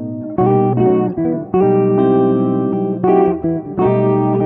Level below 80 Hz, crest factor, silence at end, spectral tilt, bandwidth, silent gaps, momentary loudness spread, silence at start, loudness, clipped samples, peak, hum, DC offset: -46 dBFS; 12 dB; 0 s; -12.5 dB/octave; 3.9 kHz; none; 5 LU; 0 s; -15 LUFS; under 0.1%; -2 dBFS; none; under 0.1%